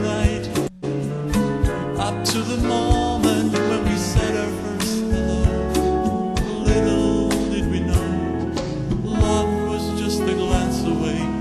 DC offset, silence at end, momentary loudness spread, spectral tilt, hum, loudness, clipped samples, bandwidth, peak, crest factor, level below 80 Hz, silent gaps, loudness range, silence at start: under 0.1%; 0 s; 5 LU; -5.5 dB/octave; none; -21 LUFS; under 0.1%; 13 kHz; -4 dBFS; 16 dB; -28 dBFS; none; 1 LU; 0 s